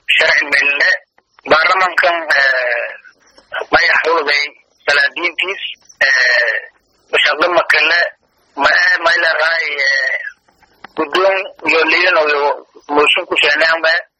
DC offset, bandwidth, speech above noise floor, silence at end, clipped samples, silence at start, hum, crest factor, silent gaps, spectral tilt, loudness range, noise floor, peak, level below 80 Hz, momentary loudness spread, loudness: under 0.1%; 14 kHz; 39 dB; 0.15 s; under 0.1%; 0.1 s; none; 14 dB; none; -1.5 dB/octave; 2 LU; -53 dBFS; 0 dBFS; -54 dBFS; 11 LU; -12 LUFS